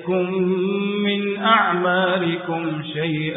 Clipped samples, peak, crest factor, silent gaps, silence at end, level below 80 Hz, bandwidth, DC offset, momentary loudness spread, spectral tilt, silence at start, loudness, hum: under 0.1%; -2 dBFS; 18 dB; none; 0 s; -64 dBFS; 4 kHz; under 0.1%; 8 LU; -11 dB/octave; 0 s; -20 LUFS; none